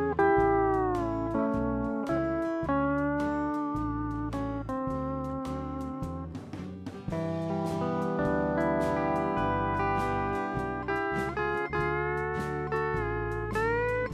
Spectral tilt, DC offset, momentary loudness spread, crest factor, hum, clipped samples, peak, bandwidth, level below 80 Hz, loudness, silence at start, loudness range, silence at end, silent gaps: -8 dB/octave; under 0.1%; 8 LU; 16 dB; none; under 0.1%; -14 dBFS; 14.5 kHz; -44 dBFS; -30 LUFS; 0 s; 5 LU; 0 s; none